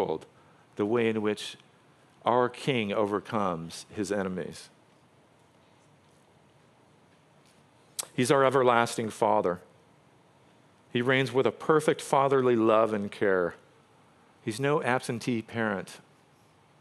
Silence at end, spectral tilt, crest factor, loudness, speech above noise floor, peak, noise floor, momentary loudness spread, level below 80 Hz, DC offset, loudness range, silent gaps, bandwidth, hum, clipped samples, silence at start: 0.85 s; -5 dB/octave; 24 dB; -28 LUFS; 34 dB; -6 dBFS; -61 dBFS; 14 LU; -74 dBFS; under 0.1%; 11 LU; none; 13.5 kHz; none; under 0.1%; 0 s